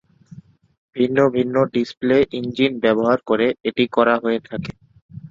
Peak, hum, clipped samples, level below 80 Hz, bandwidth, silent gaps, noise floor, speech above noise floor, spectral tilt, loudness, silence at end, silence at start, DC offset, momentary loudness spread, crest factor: -2 dBFS; none; under 0.1%; -54 dBFS; 7.4 kHz; 0.78-0.89 s, 1.97-2.01 s, 5.02-5.09 s; -44 dBFS; 26 dB; -7 dB/octave; -19 LUFS; 0 s; 0.35 s; under 0.1%; 8 LU; 18 dB